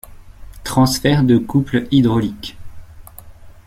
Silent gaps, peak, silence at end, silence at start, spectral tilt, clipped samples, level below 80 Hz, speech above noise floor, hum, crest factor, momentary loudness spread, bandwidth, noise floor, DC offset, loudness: none; -2 dBFS; 0.15 s; 0.1 s; -6 dB/octave; under 0.1%; -38 dBFS; 23 dB; none; 16 dB; 17 LU; 16 kHz; -38 dBFS; under 0.1%; -16 LUFS